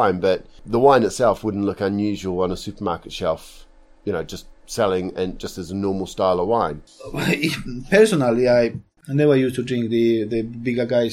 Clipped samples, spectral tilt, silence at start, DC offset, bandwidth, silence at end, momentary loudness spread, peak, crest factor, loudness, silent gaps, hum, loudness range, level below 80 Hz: under 0.1%; -6 dB/octave; 0 s; under 0.1%; 15.5 kHz; 0 s; 13 LU; 0 dBFS; 20 dB; -21 LUFS; none; none; 7 LU; -44 dBFS